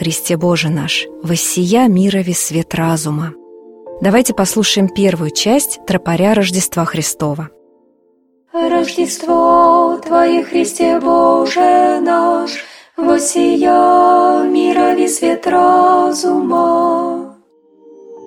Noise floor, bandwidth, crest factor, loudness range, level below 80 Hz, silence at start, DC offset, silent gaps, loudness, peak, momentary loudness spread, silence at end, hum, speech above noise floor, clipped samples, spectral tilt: -55 dBFS; 16.5 kHz; 14 dB; 4 LU; -50 dBFS; 0 s; under 0.1%; none; -13 LUFS; 0 dBFS; 9 LU; 0 s; none; 43 dB; under 0.1%; -4.5 dB/octave